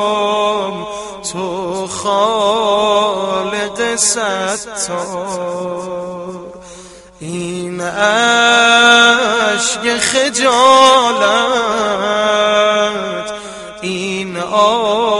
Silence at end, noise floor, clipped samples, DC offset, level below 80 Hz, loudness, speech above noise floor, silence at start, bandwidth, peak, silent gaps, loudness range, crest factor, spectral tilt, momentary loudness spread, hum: 0 s; -36 dBFS; under 0.1%; under 0.1%; -52 dBFS; -13 LUFS; 23 dB; 0 s; 11.5 kHz; 0 dBFS; none; 9 LU; 14 dB; -2 dB/octave; 16 LU; none